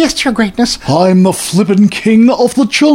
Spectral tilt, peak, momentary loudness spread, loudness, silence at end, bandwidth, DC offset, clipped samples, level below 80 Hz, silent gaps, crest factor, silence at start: -5 dB/octave; 0 dBFS; 4 LU; -10 LUFS; 0 s; 16 kHz; under 0.1%; under 0.1%; -40 dBFS; none; 10 dB; 0 s